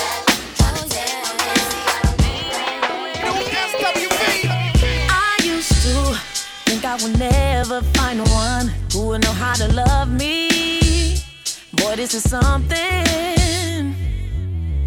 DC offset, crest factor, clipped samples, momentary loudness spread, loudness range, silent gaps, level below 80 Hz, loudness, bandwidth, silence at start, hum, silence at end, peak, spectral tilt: under 0.1%; 18 dB; under 0.1%; 6 LU; 2 LU; none; -24 dBFS; -18 LUFS; 20 kHz; 0 s; none; 0 s; 0 dBFS; -4 dB/octave